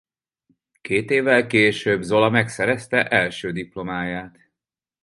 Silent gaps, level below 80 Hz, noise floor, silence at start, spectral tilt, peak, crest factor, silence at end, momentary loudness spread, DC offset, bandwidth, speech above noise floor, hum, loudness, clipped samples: none; -56 dBFS; -88 dBFS; 0.85 s; -5.5 dB/octave; -2 dBFS; 20 dB; 0.75 s; 12 LU; under 0.1%; 11.5 kHz; 67 dB; none; -20 LUFS; under 0.1%